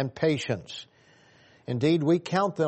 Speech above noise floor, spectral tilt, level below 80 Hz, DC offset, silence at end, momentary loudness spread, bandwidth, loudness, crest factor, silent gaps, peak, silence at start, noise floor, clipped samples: 33 dB; -6.5 dB/octave; -68 dBFS; under 0.1%; 0 s; 17 LU; 8.4 kHz; -26 LUFS; 16 dB; none; -10 dBFS; 0 s; -58 dBFS; under 0.1%